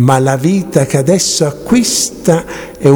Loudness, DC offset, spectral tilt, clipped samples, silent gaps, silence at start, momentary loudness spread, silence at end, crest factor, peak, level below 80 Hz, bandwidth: -12 LUFS; under 0.1%; -5 dB/octave; 0.3%; none; 0 s; 4 LU; 0 s; 12 dB; 0 dBFS; -42 dBFS; over 20 kHz